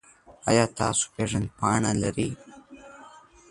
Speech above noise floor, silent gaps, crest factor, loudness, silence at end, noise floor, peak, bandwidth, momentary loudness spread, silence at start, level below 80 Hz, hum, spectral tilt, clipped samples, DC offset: 25 dB; none; 22 dB; -26 LUFS; 0.3 s; -50 dBFS; -6 dBFS; 11.5 kHz; 16 LU; 0.3 s; -50 dBFS; none; -4.5 dB/octave; under 0.1%; under 0.1%